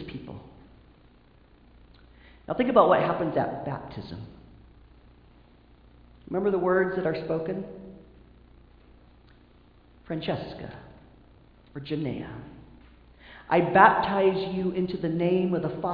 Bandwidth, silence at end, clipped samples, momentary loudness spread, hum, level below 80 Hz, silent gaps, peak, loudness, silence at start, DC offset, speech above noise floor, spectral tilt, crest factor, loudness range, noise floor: 5.2 kHz; 0 s; under 0.1%; 24 LU; 60 Hz at -55 dBFS; -56 dBFS; none; -2 dBFS; -25 LUFS; 0 s; under 0.1%; 31 dB; -9.5 dB/octave; 26 dB; 14 LU; -57 dBFS